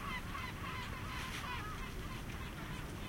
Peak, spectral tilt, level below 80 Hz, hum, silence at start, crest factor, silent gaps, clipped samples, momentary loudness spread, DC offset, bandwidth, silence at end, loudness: -30 dBFS; -4.5 dB/octave; -50 dBFS; none; 0 s; 14 dB; none; under 0.1%; 3 LU; under 0.1%; 16.5 kHz; 0 s; -44 LUFS